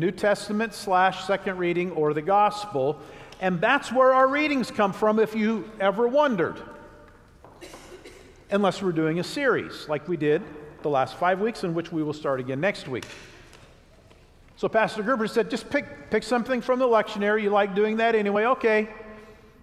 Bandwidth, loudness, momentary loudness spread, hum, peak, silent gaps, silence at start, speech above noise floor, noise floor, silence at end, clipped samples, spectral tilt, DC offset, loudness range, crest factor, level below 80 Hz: 14 kHz; -24 LUFS; 12 LU; none; -6 dBFS; none; 0 s; 29 dB; -53 dBFS; 0.3 s; under 0.1%; -5.5 dB/octave; under 0.1%; 6 LU; 18 dB; -58 dBFS